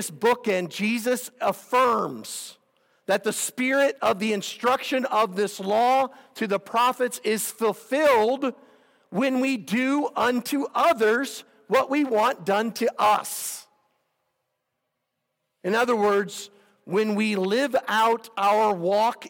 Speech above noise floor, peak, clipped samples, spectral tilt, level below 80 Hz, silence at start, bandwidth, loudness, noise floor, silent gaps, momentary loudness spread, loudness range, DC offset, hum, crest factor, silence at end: 56 dB; -10 dBFS; under 0.1%; -3.5 dB/octave; -72 dBFS; 0 s; over 20 kHz; -24 LUFS; -79 dBFS; none; 10 LU; 4 LU; under 0.1%; none; 16 dB; 0 s